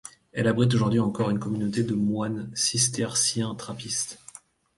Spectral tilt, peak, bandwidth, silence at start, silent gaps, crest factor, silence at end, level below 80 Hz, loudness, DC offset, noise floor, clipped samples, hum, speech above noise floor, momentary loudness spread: -4 dB/octave; -8 dBFS; 11.5 kHz; 0.05 s; none; 18 dB; 0.6 s; -58 dBFS; -25 LUFS; under 0.1%; -50 dBFS; under 0.1%; none; 25 dB; 10 LU